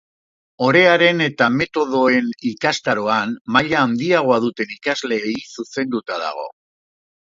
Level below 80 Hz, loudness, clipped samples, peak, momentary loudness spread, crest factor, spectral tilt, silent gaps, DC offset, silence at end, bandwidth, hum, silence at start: -60 dBFS; -18 LUFS; under 0.1%; 0 dBFS; 12 LU; 18 dB; -5 dB/octave; 3.41-3.45 s; under 0.1%; 0.8 s; 7.8 kHz; none; 0.6 s